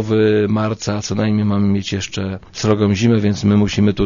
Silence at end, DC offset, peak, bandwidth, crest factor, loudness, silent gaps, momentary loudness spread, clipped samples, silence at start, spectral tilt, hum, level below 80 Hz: 0 s; under 0.1%; 0 dBFS; 7.4 kHz; 16 dB; -17 LUFS; none; 8 LU; under 0.1%; 0 s; -6.5 dB/octave; none; -40 dBFS